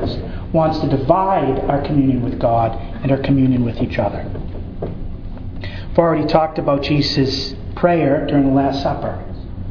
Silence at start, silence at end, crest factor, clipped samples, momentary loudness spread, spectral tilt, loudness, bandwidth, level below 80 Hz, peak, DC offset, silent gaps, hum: 0 s; 0 s; 18 dB; under 0.1%; 14 LU; -8 dB/octave; -18 LUFS; 5.4 kHz; -30 dBFS; 0 dBFS; under 0.1%; none; none